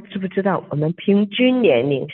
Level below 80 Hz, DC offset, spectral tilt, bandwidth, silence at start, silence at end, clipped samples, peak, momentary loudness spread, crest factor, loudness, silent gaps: -66 dBFS; under 0.1%; -10 dB/octave; 4.2 kHz; 0 s; 0 s; under 0.1%; -4 dBFS; 7 LU; 14 dB; -18 LUFS; none